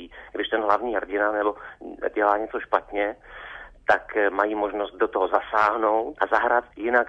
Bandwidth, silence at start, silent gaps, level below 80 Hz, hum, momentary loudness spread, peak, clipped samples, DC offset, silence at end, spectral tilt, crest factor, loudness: 8.2 kHz; 0 s; none; -54 dBFS; none; 12 LU; -6 dBFS; under 0.1%; under 0.1%; 0 s; -5 dB/octave; 20 dB; -24 LUFS